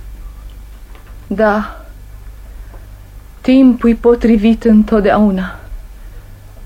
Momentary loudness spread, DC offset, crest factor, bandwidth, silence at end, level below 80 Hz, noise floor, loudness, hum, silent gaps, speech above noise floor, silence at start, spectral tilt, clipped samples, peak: 25 LU; under 0.1%; 14 dB; 9 kHz; 0 s; -30 dBFS; -34 dBFS; -12 LUFS; none; none; 24 dB; 0 s; -8 dB/octave; under 0.1%; 0 dBFS